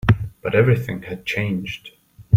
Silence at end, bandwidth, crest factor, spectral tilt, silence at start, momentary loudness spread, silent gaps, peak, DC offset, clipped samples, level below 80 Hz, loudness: 0 s; 15.5 kHz; 18 dB; -7.5 dB/octave; 0.05 s; 13 LU; none; -2 dBFS; under 0.1%; under 0.1%; -42 dBFS; -21 LUFS